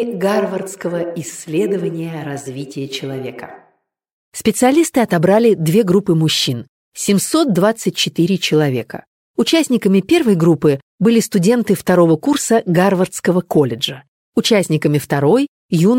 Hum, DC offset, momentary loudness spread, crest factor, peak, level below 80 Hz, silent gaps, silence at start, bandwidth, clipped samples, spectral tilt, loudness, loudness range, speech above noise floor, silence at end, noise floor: none; under 0.1%; 13 LU; 14 dB; -2 dBFS; -56 dBFS; 4.12-4.32 s, 6.69-6.92 s, 9.07-9.34 s, 10.83-10.98 s, 14.08-14.32 s, 15.48-15.69 s; 0 s; 17 kHz; under 0.1%; -5.5 dB/octave; -15 LUFS; 8 LU; 46 dB; 0 s; -61 dBFS